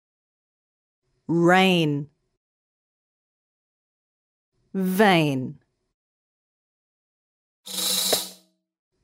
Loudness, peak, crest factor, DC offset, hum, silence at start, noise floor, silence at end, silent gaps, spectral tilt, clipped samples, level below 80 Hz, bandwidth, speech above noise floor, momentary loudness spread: -21 LUFS; -4 dBFS; 22 dB; under 0.1%; none; 1.3 s; -53 dBFS; 0.7 s; 2.37-4.52 s, 5.94-7.64 s; -4 dB/octave; under 0.1%; -72 dBFS; 16 kHz; 33 dB; 17 LU